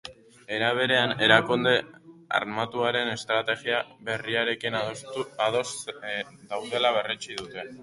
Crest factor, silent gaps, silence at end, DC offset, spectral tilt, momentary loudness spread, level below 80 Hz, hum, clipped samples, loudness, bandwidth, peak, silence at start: 24 dB; none; 0 s; under 0.1%; -3.5 dB/octave; 14 LU; -66 dBFS; none; under 0.1%; -26 LUFS; 11.5 kHz; -2 dBFS; 0.05 s